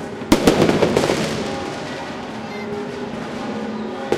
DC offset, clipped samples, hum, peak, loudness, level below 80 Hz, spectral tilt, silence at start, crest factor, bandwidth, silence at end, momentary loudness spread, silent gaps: under 0.1%; under 0.1%; none; 0 dBFS; -21 LUFS; -40 dBFS; -5 dB/octave; 0 s; 20 dB; 15.5 kHz; 0 s; 13 LU; none